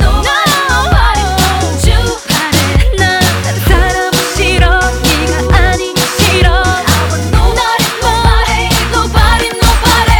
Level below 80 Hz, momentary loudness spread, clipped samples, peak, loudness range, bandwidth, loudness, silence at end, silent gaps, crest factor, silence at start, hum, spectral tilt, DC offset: -14 dBFS; 3 LU; 0.2%; 0 dBFS; 1 LU; 19.5 kHz; -10 LUFS; 0 s; none; 10 dB; 0 s; none; -4 dB/octave; under 0.1%